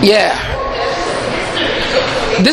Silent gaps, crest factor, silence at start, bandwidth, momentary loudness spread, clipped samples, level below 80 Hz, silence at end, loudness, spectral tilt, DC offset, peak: none; 14 dB; 0 s; 14.5 kHz; 6 LU; under 0.1%; -30 dBFS; 0 s; -15 LUFS; -4 dB/octave; under 0.1%; 0 dBFS